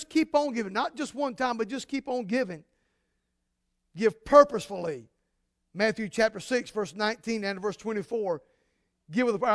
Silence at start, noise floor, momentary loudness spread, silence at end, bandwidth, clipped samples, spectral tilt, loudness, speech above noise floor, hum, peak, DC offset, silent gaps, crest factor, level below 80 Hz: 0 s; -79 dBFS; 11 LU; 0 s; 11 kHz; under 0.1%; -4.5 dB/octave; -28 LUFS; 52 dB; none; -4 dBFS; under 0.1%; none; 24 dB; -62 dBFS